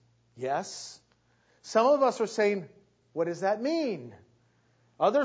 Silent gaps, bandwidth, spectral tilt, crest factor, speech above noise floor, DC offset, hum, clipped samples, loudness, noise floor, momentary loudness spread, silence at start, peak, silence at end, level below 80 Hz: none; 8 kHz; -4.5 dB/octave; 18 dB; 40 dB; under 0.1%; none; under 0.1%; -29 LUFS; -67 dBFS; 18 LU; 0.35 s; -12 dBFS; 0 s; -78 dBFS